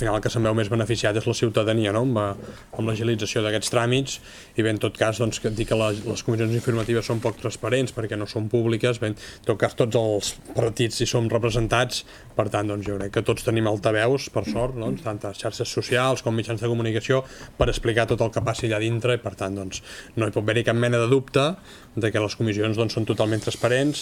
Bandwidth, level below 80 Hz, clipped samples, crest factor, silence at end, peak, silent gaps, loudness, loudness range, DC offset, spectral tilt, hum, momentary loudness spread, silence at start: 15 kHz; -44 dBFS; under 0.1%; 20 dB; 0 s; -4 dBFS; none; -24 LUFS; 2 LU; under 0.1%; -5.5 dB/octave; none; 8 LU; 0 s